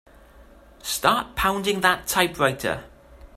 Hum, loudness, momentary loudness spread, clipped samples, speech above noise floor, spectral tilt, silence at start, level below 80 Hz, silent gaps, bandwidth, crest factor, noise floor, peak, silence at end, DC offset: none; -22 LUFS; 8 LU; under 0.1%; 27 dB; -3 dB/octave; 0.4 s; -46 dBFS; none; 16 kHz; 22 dB; -49 dBFS; -2 dBFS; 0.1 s; under 0.1%